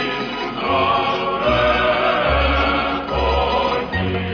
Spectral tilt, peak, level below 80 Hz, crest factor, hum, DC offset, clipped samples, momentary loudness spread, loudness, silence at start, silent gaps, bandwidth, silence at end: -6.5 dB/octave; -4 dBFS; -30 dBFS; 14 dB; none; under 0.1%; under 0.1%; 6 LU; -18 LUFS; 0 s; none; 5.4 kHz; 0 s